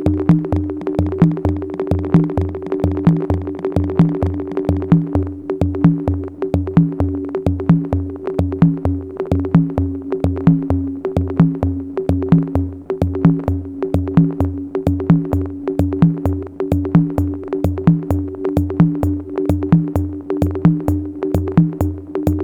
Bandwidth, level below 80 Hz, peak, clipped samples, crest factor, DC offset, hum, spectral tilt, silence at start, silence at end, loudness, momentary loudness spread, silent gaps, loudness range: 4.9 kHz; -32 dBFS; 0 dBFS; under 0.1%; 16 dB; under 0.1%; none; -10.5 dB/octave; 0 s; 0 s; -18 LUFS; 6 LU; none; 1 LU